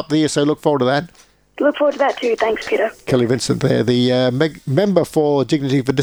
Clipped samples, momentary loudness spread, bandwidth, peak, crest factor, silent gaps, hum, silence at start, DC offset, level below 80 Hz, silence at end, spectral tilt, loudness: under 0.1%; 4 LU; over 20 kHz; 0 dBFS; 16 dB; none; none; 0 s; under 0.1%; -52 dBFS; 0 s; -6 dB/octave; -17 LUFS